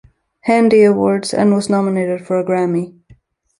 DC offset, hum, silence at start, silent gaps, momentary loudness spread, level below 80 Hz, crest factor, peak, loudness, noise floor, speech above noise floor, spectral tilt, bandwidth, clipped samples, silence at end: under 0.1%; none; 0.45 s; none; 10 LU; -56 dBFS; 14 dB; -2 dBFS; -15 LUFS; -49 dBFS; 36 dB; -6.5 dB/octave; 11.5 kHz; under 0.1%; 0.7 s